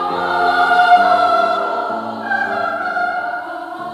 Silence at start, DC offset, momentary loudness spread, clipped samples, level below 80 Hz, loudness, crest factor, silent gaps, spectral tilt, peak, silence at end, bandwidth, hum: 0 s; under 0.1%; 13 LU; under 0.1%; -62 dBFS; -16 LUFS; 16 dB; none; -4 dB/octave; 0 dBFS; 0 s; 12 kHz; none